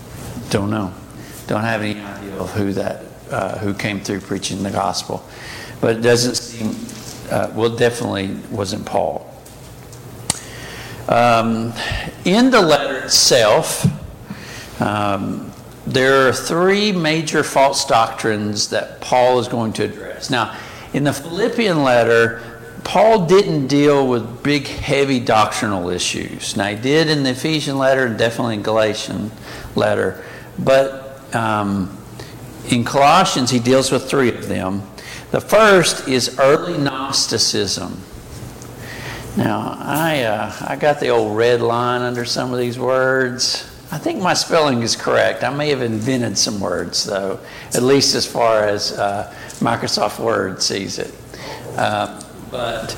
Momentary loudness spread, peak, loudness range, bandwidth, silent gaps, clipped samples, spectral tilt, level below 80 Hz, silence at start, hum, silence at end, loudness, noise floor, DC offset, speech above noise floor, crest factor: 18 LU; 0 dBFS; 7 LU; 17 kHz; none; under 0.1%; -4 dB/octave; -46 dBFS; 0 s; none; 0 s; -17 LUFS; -37 dBFS; under 0.1%; 20 dB; 18 dB